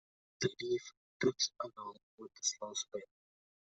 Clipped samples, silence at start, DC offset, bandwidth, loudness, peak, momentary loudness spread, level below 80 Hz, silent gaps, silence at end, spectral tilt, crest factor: under 0.1%; 0.4 s; under 0.1%; 8.2 kHz; -38 LUFS; -20 dBFS; 17 LU; -78 dBFS; 0.97-1.20 s, 2.03-2.18 s; 0.6 s; -2.5 dB/octave; 22 dB